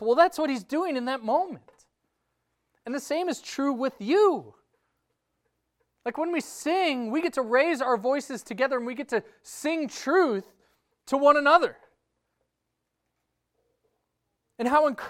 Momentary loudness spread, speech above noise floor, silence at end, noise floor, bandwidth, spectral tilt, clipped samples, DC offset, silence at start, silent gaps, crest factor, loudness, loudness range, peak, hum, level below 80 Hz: 13 LU; 56 dB; 0 s; -81 dBFS; 16 kHz; -4 dB/octave; under 0.1%; under 0.1%; 0 s; none; 20 dB; -26 LUFS; 6 LU; -6 dBFS; none; -72 dBFS